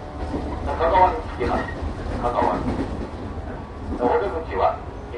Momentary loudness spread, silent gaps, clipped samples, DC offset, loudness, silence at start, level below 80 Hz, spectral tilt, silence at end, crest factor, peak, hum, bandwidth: 13 LU; none; under 0.1%; under 0.1%; -24 LUFS; 0 s; -34 dBFS; -7.5 dB/octave; 0 s; 20 dB; -2 dBFS; none; 11 kHz